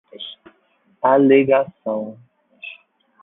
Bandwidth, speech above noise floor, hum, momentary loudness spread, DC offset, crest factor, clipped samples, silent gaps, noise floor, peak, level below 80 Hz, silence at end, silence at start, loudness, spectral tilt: 3.9 kHz; 45 dB; none; 23 LU; under 0.1%; 18 dB; under 0.1%; none; -61 dBFS; -2 dBFS; -64 dBFS; 0.5 s; 0.2 s; -17 LUFS; -11 dB/octave